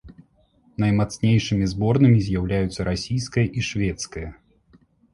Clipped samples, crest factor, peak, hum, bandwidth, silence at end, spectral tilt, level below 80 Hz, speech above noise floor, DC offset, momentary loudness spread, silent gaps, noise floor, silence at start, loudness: under 0.1%; 18 dB; -4 dBFS; none; 11.5 kHz; 0.8 s; -6.5 dB/octave; -40 dBFS; 39 dB; under 0.1%; 14 LU; none; -59 dBFS; 0.05 s; -22 LUFS